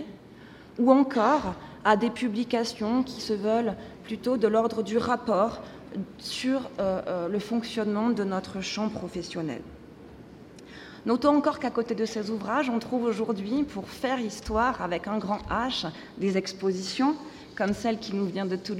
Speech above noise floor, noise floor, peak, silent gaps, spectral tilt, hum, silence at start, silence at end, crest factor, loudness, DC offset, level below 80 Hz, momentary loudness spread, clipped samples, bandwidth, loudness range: 21 dB; -48 dBFS; -6 dBFS; none; -5.5 dB/octave; none; 0 s; 0 s; 22 dB; -28 LUFS; under 0.1%; -54 dBFS; 16 LU; under 0.1%; 14 kHz; 4 LU